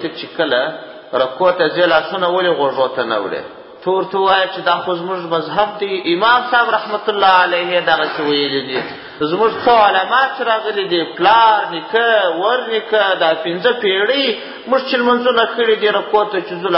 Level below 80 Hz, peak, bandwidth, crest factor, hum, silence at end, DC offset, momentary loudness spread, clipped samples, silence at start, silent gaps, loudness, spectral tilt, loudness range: -58 dBFS; 0 dBFS; 5.8 kHz; 16 dB; none; 0 s; under 0.1%; 9 LU; under 0.1%; 0 s; none; -15 LUFS; -8.5 dB/octave; 3 LU